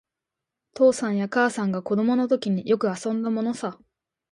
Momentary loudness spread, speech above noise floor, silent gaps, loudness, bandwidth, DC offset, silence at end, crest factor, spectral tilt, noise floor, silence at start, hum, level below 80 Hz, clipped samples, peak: 7 LU; 63 dB; none; -24 LUFS; 11.5 kHz; under 0.1%; 0.6 s; 16 dB; -6 dB/octave; -86 dBFS; 0.75 s; none; -70 dBFS; under 0.1%; -8 dBFS